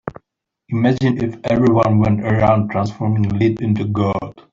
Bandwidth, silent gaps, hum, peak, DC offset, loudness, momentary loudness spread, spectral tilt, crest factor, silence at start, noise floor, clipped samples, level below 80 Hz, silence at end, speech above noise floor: 7.4 kHz; none; none; -2 dBFS; under 0.1%; -17 LUFS; 7 LU; -9 dB/octave; 14 dB; 0.05 s; -71 dBFS; under 0.1%; -44 dBFS; 0.1 s; 55 dB